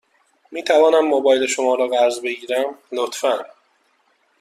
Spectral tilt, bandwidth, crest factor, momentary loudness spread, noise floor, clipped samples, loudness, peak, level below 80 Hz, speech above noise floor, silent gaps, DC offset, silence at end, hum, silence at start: -1.5 dB/octave; 14 kHz; 16 dB; 11 LU; -62 dBFS; under 0.1%; -18 LUFS; -4 dBFS; -70 dBFS; 45 dB; none; under 0.1%; 0.95 s; none; 0.5 s